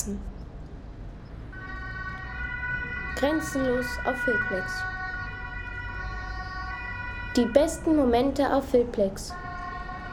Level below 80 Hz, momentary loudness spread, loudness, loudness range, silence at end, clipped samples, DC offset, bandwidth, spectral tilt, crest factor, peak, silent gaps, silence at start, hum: -40 dBFS; 18 LU; -28 LUFS; 6 LU; 0 s; under 0.1%; under 0.1%; 19 kHz; -5.5 dB/octave; 22 dB; -6 dBFS; none; 0 s; none